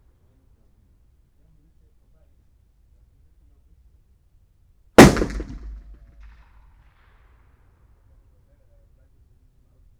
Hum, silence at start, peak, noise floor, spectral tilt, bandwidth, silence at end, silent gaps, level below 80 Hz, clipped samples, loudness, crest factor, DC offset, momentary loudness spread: none; 5 s; 0 dBFS; -58 dBFS; -5.5 dB/octave; over 20 kHz; 4.3 s; none; -38 dBFS; under 0.1%; -14 LUFS; 24 dB; under 0.1%; 31 LU